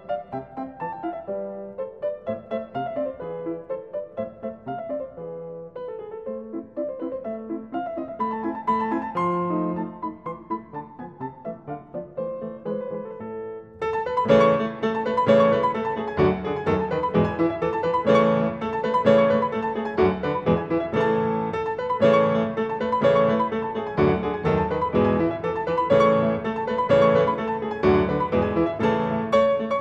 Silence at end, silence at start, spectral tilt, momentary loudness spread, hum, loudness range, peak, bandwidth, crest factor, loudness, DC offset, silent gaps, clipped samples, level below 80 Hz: 0 s; 0 s; -8 dB/octave; 16 LU; none; 12 LU; -4 dBFS; 7.8 kHz; 20 dB; -23 LUFS; under 0.1%; none; under 0.1%; -50 dBFS